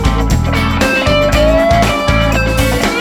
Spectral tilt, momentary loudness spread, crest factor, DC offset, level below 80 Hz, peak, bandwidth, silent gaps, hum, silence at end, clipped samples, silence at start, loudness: -5 dB/octave; 3 LU; 10 dB; under 0.1%; -18 dBFS; 0 dBFS; 19.5 kHz; none; none; 0 s; under 0.1%; 0 s; -12 LUFS